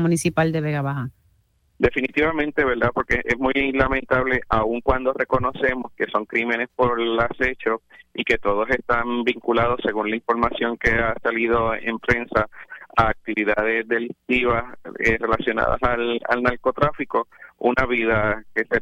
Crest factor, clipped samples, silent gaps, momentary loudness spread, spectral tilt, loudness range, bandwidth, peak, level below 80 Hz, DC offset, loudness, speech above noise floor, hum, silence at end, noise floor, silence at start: 18 dB; under 0.1%; none; 5 LU; -6 dB/octave; 2 LU; 15 kHz; -4 dBFS; -38 dBFS; under 0.1%; -22 LUFS; 41 dB; none; 0 s; -63 dBFS; 0 s